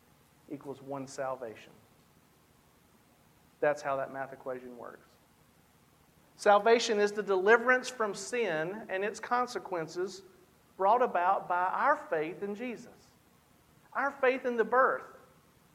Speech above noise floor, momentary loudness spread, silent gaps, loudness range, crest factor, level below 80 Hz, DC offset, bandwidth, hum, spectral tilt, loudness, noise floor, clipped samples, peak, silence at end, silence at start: 34 dB; 18 LU; none; 10 LU; 22 dB; -76 dBFS; under 0.1%; 15.5 kHz; none; -3.5 dB/octave; -30 LUFS; -64 dBFS; under 0.1%; -10 dBFS; 0.65 s; 0.5 s